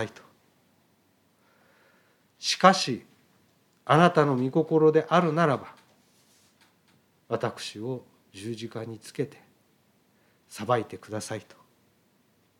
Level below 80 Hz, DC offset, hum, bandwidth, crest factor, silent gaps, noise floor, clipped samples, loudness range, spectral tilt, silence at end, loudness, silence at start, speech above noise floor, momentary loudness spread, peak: -78 dBFS; under 0.1%; none; 15.5 kHz; 26 dB; none; -66 dBFS; under 0.1%; 13 LU; -5.5 dB/octave; 1.2 s; -26 LUFS; 0 s; 41 dB; 18 LU; -4 dBFS